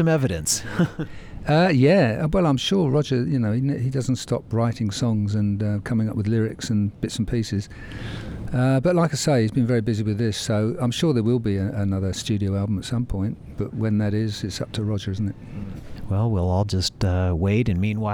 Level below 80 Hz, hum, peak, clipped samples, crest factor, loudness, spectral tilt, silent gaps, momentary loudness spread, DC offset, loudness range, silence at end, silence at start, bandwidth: -42 dBFS; none; -6 dBFS; under 0.1%; 16 dB; -23 LUFS; -6 dB/octave; none; 9 LU; under 0.1%; 5 LU; 0 s; 0 s; 17 kHz